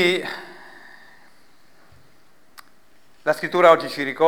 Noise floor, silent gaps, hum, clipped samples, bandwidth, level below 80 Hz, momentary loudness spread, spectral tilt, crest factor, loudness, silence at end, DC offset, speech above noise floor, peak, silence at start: -58 dBFS; none; none; under 0.1%; over 20 kHz; -72 dBFS; 27 LU; -4.5 dB/octave; 22 dB; -19 LUFS; 0 s; 0.4%; 40 dB; -2 dBFS; 0 s